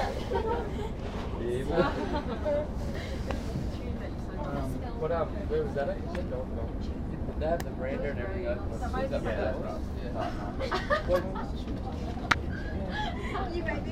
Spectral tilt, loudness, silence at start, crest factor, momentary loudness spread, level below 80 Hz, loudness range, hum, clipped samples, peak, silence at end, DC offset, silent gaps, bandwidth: -6.5 dB/octave; -33 LUFS; 0 s; 24 dB; 7 LU; -38 dBFS; 2 LU; none; under 0.1%; -8 dBFS; 0 s; under 0.1%; none; 15 kHz